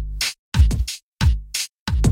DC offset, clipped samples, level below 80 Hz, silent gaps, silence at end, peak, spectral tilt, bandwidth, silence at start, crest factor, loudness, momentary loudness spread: under 0.1%; under 0.1%; -22 dBFS; 0.39-0.52 s, 1.03-1.13 s, 1.74-1.86 s; 0 s; -4 dBFS; -4 dB/octave; 16.5 kHz; 0 s; 16 dB; -22 LUFS; 7 LU